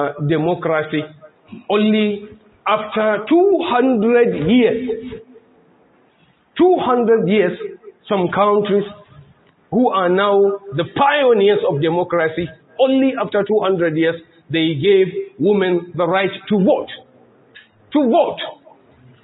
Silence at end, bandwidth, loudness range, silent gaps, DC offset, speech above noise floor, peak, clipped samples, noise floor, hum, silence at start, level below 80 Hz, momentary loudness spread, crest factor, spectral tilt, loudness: 0.7 s; 4.1 kHz; 3 LU; none; under 0.1%; 40 dB; -2 dBFS; under 0.1%; -56 dBFS; none; 0 s; -56 dBFS; 13 LU; 14 dB; -11.5 dB/octave; -16 LUFS